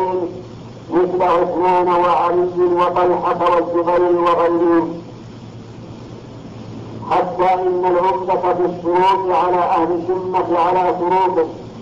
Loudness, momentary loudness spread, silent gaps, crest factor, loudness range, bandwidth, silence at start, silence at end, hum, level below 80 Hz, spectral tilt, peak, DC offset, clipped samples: -16 LUFS; 20 LU; none; 10 dB; 5 LU; 7.4 kHz; 0 s; 0 s; none; -48 dBFS; -7.5 dB/octave; -8 dBFS; under 0.1%; under 0.1%